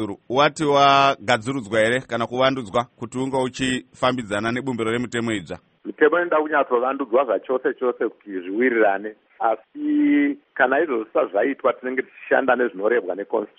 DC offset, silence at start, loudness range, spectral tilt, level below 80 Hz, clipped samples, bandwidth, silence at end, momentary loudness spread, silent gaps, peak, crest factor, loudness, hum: under 0.1%; 0 s; 3 LU; -5 dB/octave; -58 dBFS; under 0.1%; 8.8 kHz; 0.15 s; 9 LU; none; -4 dBFS; 18 dB; -21 LUFS; none